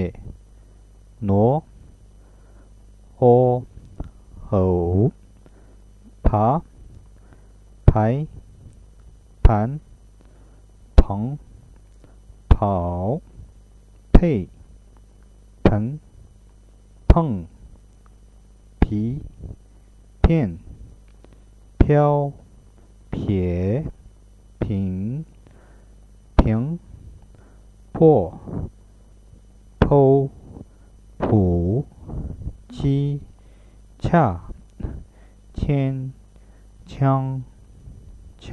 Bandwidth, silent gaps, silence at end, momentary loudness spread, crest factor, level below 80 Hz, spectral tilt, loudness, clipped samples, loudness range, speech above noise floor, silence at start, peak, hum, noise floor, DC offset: 9.6 kHz; none; 0 s; 20 LU; 22 dB; -28 dBFS; -10 dB/octave; -21 LUFS; under 0.1%; 5 LU; 29 dB; 0 s; 0 dBFS; 50 Hz at -45 dBFS; -49 dBFS; under 0.1%